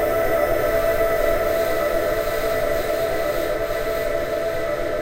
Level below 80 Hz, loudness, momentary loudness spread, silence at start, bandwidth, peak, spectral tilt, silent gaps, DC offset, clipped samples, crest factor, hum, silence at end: -34 dBFS; -22 LUFS; 4 LU; 0 s; 16 kHz; -6 dBFS; -4.5 dB/octave; none; under 0.1%; under 0.1%; 14 dB; none; 0 s